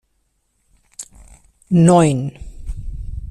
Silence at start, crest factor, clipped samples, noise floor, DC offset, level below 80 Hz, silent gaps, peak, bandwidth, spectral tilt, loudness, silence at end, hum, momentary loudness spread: 1 s; 20 dB; under 0.1%; -66 dBFS; under 0.1%; -34 dBFS; none; 0 dBFS; 11.5 kHz; -7 dB/octave; -15 LUFS; 0 s; none; 25 LU